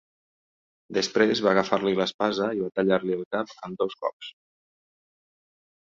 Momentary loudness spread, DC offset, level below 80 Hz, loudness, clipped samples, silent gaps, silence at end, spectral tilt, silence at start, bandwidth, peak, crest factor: 11 LU; under 0.1%; -68 dBFS; -25 LUFS; under 0.1%; 2.14-2.19 s, 3.26-3.31 s, 4.13-4.20 s; 1.65 s; -5 dB/octave; 0.9 s; 7.6 kHz; -6 dBFS; 22 dB